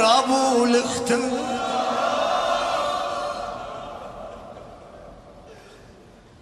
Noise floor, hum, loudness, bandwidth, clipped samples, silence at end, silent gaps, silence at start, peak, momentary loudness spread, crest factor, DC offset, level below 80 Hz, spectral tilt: -48 dBFS; none; -22 LUFS; 15 kHz; under 0.1%; 0.5 s; none; 0 s; -4 dBFS; 22 LU; 20 dB; under 0.1%; -54 dBFS; -3 dB/octave